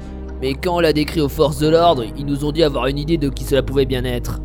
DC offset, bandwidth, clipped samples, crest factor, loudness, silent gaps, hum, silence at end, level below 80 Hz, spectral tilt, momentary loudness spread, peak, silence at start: under 0.1%; 18 kHz; under 0.1%; 16 dB; -18 LUFS; none; none; 0 s; -28 dBFS; -6 dB/octave; 9 LU; 0 dBFS; 0 s